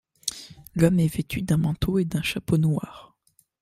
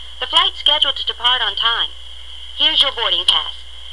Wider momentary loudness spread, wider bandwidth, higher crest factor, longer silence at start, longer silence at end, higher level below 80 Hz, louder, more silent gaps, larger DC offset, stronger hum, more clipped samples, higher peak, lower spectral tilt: second, 12 LU vs 19 LU; first, 15.5 kHz vs 12 kHz; about the same, 20 dB vs 16 dB; first, 0.25 s vs 0 s; first, 0.6 s vs 0 s; about the same, -44 dBFS vs -42 dBFS; second, -25 LUFS vs -14 LUFS; neither; second, under 0.1% vs 2%; second, none vs 60 Hz at -40 dBFS; neither; second, -6 dBFS vs -2 dBFS; first, -6 dB/octave vs -0.5 dB/octave